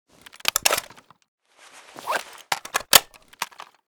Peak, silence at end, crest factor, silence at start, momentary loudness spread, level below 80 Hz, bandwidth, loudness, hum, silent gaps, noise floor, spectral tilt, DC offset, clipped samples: 0 dBFS; 0.45 s; 26 dB; 0.55 s; 18 LU; -58 dBFS; over 20 kHz; -21 LUFS; none; 1.28-1.38 s; -50 dBFS; 1 dB/octave; under 0.1%; under 0.1%